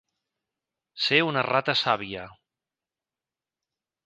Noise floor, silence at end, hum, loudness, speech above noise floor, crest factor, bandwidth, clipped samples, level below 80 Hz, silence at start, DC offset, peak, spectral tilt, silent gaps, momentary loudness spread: under -90 dBFS; 1.75 s; none; -24 LUFS; over 65 dB; 24 dB; 9.6 kHz; under 0.1%; -68 dBFS; 0.95 s; under 0.1%; -4 dBFS; -4.5 dB/octave; none; 11 LU